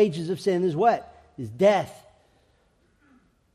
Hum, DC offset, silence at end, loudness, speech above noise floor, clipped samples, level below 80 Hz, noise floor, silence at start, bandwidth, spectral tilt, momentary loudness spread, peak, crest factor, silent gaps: none; under 0.1%; 1.6 s; -23 LUFS; 42 dB; under 0.1%; -64 dBFS; -65 dBFS; 0 s; 13.5 kHz; -6.5 dB/octave; 17 LU; -8 dBFS; 18 dB; none